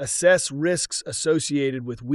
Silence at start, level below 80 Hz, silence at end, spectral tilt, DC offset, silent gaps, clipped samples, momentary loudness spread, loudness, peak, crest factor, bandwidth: 0 s; -58 dBFS; 0 s; -3.5 dB/octave; under 0.1%; none; under 0.1%; 8 LU; -22 LUFS; -6 dBFS; 18 dB; 13.5 kHz